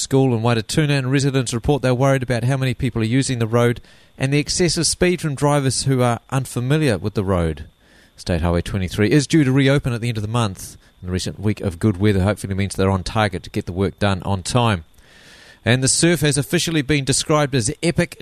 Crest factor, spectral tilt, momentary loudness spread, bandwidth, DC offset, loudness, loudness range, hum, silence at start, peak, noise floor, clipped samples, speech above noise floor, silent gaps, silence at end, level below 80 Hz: 16 dB; -5 dB/octave; 8 LU; 13.5 kHz; under 0.1%; -19 LUFS; 3 LU; none; 0 s; -2 dBFS; -47 dBFS; under 0.1%; 28 dB; none; 0.05 s; -40 dBFS